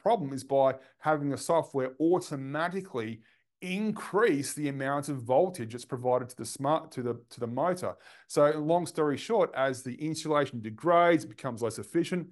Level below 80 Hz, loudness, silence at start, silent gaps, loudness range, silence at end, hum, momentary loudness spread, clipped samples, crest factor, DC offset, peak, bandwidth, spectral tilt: -76 dBFS; -30 LUFS; 0.05 s; none; 3 LU; 0 s; none; 10 LU; under 0.1%; 18 dB; under 0.1%; -10 dBFS; 12 kHz; -5.5 dB/octave